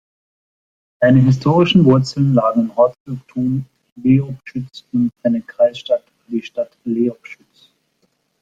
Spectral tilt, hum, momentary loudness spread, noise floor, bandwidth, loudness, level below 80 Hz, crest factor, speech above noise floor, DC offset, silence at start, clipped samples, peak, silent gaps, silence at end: -8 dB/octave; none; 14 LU; -65 dBFS; 7.8 kHz; -17 LUFS; -52 dBFS; 16 dB; 49 dB; under 0.1%; 1 s; under 0.1%; -2 dBFS; 3.00-3.05 s, 3.92-3.96 s; 1.1 s